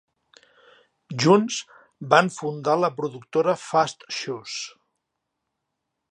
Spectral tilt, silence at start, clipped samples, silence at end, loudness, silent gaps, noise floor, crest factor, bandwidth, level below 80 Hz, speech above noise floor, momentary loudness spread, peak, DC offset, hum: -4.5 dB/octave; 1.1 s; under 0.1%; 1.4 s; -23 LUFS; none; -81 dBFS; 24 dB; 11 kHz; -74 dBFS; 58 dB; 14 LU; -2 dBFS; under 0.1%; none